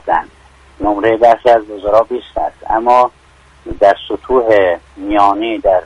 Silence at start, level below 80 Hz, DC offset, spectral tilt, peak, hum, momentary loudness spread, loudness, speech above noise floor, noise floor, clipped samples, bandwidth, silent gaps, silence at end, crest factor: 0.05 s; -38 dBFS; under 0.1%; -6 dB/octave; 0 dBFS; none; 9 LU; -13 LUFS; 32 dB; -43 dBFS; under 0.1%; 10 kHz; none; 0 s; 14 dB